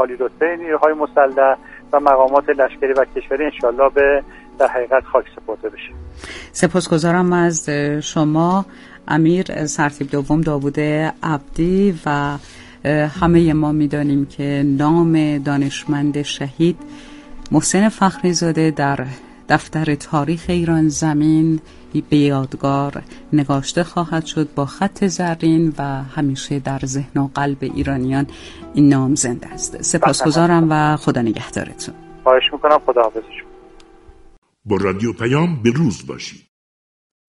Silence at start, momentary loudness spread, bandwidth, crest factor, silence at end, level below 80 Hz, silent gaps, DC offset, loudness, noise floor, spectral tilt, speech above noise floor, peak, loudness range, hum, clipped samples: 0 s; 11 LU; 11.5 kHz; 18 dB; 0.95 s; -42 dBFS; 34.38-34.42 s; under 0.1%; -17 LUFS; -44 dBFS; -5.5 dB/octave; 27 dB; 0 dBFS; 4 LU; none; under 0.1%